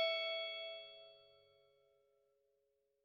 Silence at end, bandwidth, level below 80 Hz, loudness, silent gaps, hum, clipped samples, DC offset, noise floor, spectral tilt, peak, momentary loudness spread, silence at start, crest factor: 1.8 s; 7 kHz; under -90 dBFS; -42 LUFS; none; none; under 0.1%; under 0.1%; -82 dBFS; 0 dB/octave; -26 dBFS; 21 LU; 0 s; 20 dB